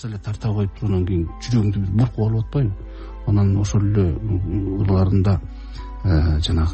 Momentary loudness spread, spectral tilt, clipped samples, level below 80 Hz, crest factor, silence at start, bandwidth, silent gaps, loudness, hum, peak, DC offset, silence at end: 10 LU; -7.5 dB/octave; under 0.1%; -30 dBFS; 12 dB; 0 s; 8.4 kHz; none; -21 LUFS; none; -8 dBFS; under 0.1%; 0 s